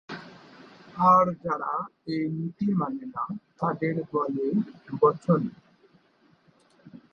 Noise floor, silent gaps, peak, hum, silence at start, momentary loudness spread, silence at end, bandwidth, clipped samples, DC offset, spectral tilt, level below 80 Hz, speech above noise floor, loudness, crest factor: -63 dBFS; none; -8 dBFS; none; 0.1 s; 15 LU; 0.15 s; 7.2 kHz; under 0.1%; under 0.1%; -9 dB/octave; -66 dBFS; 37 dB; -26 LUFS; 20 dB